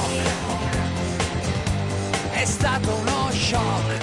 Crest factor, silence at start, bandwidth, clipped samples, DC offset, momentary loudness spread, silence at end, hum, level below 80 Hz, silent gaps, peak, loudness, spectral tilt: 12 dB; 0 s; 11.5 kHz; under 0.1%; under 0.1%; 4 LU; 0 s; none; -38 dBFS; none; -10 dBFS; -23 LUFS; -4.5 dB/octave